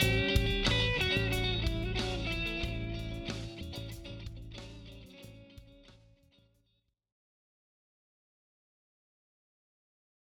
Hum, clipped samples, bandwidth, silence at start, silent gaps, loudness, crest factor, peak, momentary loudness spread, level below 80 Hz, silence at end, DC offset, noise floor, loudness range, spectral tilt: none; under 0.1%; 18 kHz; 0 s; none; -32 LUFS; 24 dB; -14 dBFS; 22 LU; -42 dBFS; 4.35 s; under 0.1%; -78 dBFS; 22 LU; -4.5 dB/octave